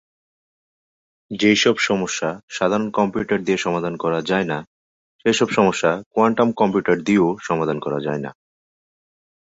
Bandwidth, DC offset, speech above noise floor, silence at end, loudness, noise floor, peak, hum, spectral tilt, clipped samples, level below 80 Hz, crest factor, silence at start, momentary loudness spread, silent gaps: 8 kHz; under 0.1%; over 71 dB; 1.2 s; -20 LUFS; under -90 dBFS; -2 dBFS; none; -4.5 dB/octave; under 0.1%; -58 dBFS; 20 dB; 1.3 s; 8 LU; 2.43-2.48 s, 4.67-5.19 s, 6.06-6.11 s